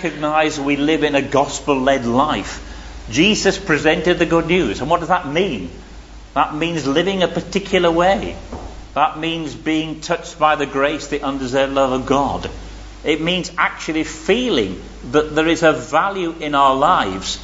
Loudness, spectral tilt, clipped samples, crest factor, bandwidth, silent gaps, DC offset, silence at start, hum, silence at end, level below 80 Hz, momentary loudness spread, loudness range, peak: -18 LUFS; -4.5 dB/octave; under 0.1%; 16 dB; 8 kHz; none; under 0.1%; 0 s; none; 0 s; -38 dBFS; 10 LU; 3 LU; 0 dBFS